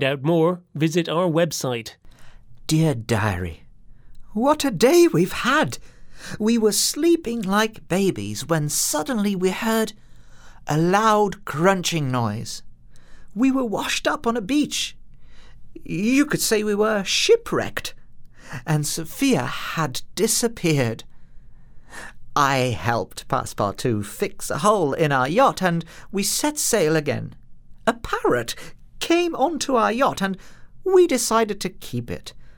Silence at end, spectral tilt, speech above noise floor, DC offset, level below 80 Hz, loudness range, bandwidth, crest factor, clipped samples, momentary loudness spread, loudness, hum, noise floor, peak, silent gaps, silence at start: 0.05 s; -4.5 dB/octave; 21 dB; under 0.1%; -48 dBFS; 4 LU; over 20 kHz; 20 dB; under 0.1%; 13 LU; -21 LUFS; none; -42 dBFS; -2 dBFS; none; 0 s